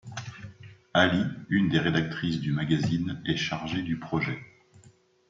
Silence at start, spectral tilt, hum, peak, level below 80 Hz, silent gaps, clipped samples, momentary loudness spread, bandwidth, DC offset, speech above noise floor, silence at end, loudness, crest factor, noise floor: 0.05 s; -6 dB/octave; none; -6 dBFS; -60 dBFS; none; under 0.1%; 16 LU; 7.6 kHz; under 0.1%; 32 dB; 0.4 s; -27 LUFS; 22 dB; -58 dBFS